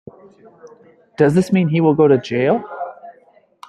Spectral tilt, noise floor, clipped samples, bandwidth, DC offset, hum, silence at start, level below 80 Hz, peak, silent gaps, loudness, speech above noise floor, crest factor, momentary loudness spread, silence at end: -8 dB/octave; -52 dBFS; under 0.1%; 12 kHz; under 0.1%; none; 0.65 s; -58 dBFS; -2 dBFS; none; -16 LUFS; 36 dB; 16 dB; 16 LU; 0.55 s